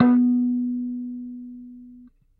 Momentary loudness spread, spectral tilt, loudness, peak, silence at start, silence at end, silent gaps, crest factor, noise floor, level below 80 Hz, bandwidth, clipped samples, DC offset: 23 LU; -10.5 dB/octave; -23 LUFS; -4 dBFS; 0 s; 0.35 s; none; 20 dB; -49 dBFS; -64 dBFS; 2.9 kHz; under 0.1%; under 0.1%